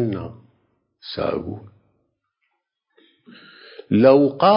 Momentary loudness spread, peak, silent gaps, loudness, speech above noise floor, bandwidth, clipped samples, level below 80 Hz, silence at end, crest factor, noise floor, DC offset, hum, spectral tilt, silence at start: 25 LU; -2 dBFS; none; -18 LUFS; 57 dB; 5.4 kHz; under 0.1%; -54 dBFS; 0 s; 20 dB; -75 dBFS; under 0.1%; none; -11.5 dB/octave; 0 s